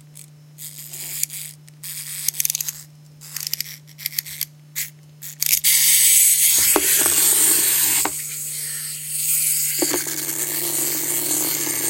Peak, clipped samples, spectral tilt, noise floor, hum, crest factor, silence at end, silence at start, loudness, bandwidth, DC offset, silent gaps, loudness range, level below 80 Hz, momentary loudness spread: 0 dBFS; under 0.1%; 0 dB/octave; -44 dBFS; none; 22 dB; 0 s; 0.15 s; -17 LUFS; 17 kHz; under 0.1%; none; 12 LU; -62 dBFS; 19 LU